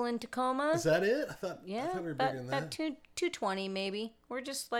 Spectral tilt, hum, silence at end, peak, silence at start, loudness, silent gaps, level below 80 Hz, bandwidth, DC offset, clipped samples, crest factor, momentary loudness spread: -4.5 dB/octave; none; 0 s; -18 dBFS; 0 s; -34 LUFS; none; -68 dBFS; 17.5 kHz; under 0.1%; under 0.1%; 16 dB; 10 LU